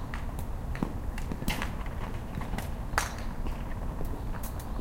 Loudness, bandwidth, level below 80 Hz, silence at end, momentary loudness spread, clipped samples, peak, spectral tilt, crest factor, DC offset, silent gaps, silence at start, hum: -36 LUFS; 17 kHz; -36 dBFS; 0 s; 6 LU; under 0.1%; -8 dBFS; -5 dB/octave; 26 dB; under 0.1%; none; 0 s; none